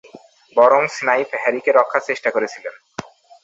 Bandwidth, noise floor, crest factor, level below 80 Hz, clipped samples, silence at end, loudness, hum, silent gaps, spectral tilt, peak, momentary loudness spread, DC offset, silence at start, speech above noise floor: 8 kHz; -45 dBFS; 18 dB; -68 dBFS; under 0.1%; 0.45 s; -17 LUFS; none; none; -4 dB/octave; -2 dBFS; 19 LU; under 0.1%; 0.15 s; 28 dB